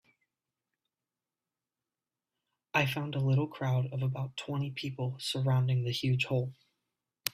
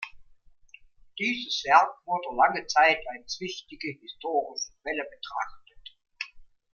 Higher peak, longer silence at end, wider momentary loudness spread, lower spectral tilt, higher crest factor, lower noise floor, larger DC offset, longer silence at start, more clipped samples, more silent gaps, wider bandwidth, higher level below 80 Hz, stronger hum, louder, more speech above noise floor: about the same, -8 dBFS vs -6 dBFS; second, 0.05 s vs 0.3 s; second, 7 LU vs 18 LU; first, -6 dB/octave vs -2 dB/octave; about the same, 26 dB vs 24 dB; first, under -90 dBFS vs -56 dBFS; neither; first, 2.75 s vs 0 s; neither; neither; first, 15.5 kHz vs 7.2 kHz; second, -68 dBFS vs -62 dBFS; neither; second, -32 LUFS vs -27 LUFS; first, over 59 dB vs 29 dB